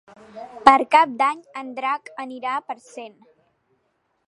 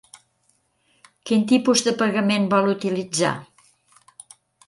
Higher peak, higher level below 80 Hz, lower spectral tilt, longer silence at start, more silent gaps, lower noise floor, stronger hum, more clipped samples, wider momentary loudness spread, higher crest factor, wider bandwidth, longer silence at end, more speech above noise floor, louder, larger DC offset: first, 0 dBFS vs -4 dBFS; first, -62 dBFS vs -68 dBFS; second, -3 dB/octave vs -4.5 dB/octave; second, 0.35 s vs 1.25 s; neither; first, -70 dBFS vs -66 dBFS; neither; neither; first, 24 LU vs 7 LU; about the same, 22 dB vs 20 dB; about the same, 11 kHz vs 11.5 kHz; about the same, 1.2 s vs 1.25 s; about the same, 50 dB vs 47 dB; about the same, -19 LUFS vs -20 LUFS; neither